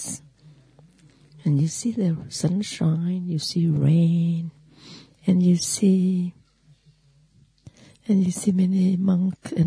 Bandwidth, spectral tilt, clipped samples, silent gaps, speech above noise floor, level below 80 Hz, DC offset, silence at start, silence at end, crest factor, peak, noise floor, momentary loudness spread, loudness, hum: 11 kHz; -6.5 dB/octave; under 0.1%; none; 37 dB; -62 dBFS; under 0.1%; 0 s; 0 s; 14 dB; -8 dBFS; -58 dBFS; 10 LU; -22 LUFS; none